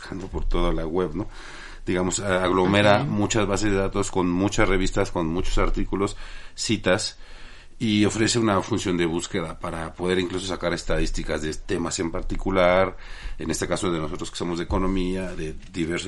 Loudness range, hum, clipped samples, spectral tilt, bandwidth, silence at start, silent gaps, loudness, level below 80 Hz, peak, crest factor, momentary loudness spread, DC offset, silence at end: 5 LU; none; under 0.1%; -4.5 dB/octave; 11.5 kHz; 0 s; none; -24 LUFS; -32 dBFS; -4 dBFS; 20 dB; 12 LU; under 0.1%; 0 s